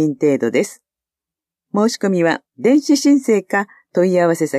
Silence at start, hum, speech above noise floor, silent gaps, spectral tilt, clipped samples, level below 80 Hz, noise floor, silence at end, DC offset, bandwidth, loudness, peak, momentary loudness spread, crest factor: 0 s; none; 72 dB; none; -5.5 dB/octave; under 0.1%; -72 dBFS; -88 dBFS; 0 s; under 0.1%; 14 kHz; -17 LUFS; -4 dBFS; 7 LU; 14 dB